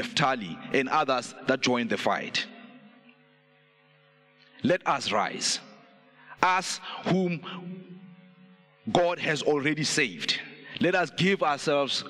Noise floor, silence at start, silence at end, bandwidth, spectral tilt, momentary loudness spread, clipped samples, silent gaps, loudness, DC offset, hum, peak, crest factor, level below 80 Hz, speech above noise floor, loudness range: -62 dBFS; 0 s; 0 s; 13.5 kHz; -3.5 dB/octave; 9 LU; under 0.1%; none; -27 LUFS; under 0.1%; none; -4 dBFS; 26 dB; -70 dBFS; 35 dB; 5 LU